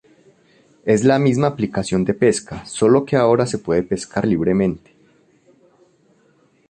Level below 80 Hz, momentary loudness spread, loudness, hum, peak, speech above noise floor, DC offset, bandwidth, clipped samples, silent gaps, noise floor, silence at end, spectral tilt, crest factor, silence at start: -48 dBFS; 8 LU; -18 LUFS; none; -2 dBFS; 40 dB; under 0.1%; 11 kHz; under 0.1%; none; -57 dBFS; 1.9 s; -6 dB/octave; 18 dB; 0.85 s